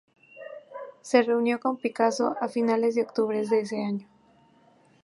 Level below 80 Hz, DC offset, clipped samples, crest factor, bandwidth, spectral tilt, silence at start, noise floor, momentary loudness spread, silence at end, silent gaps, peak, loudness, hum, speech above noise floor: -82 dBFS; under 0.1%; under 0.1%; 20 dB; 11.5 kHz; -5 dB/octave; 0.35 s; -60 dBFS; 18 LU; 1 s; none; -6 dBFS; -26 LUFS; none; 35 dB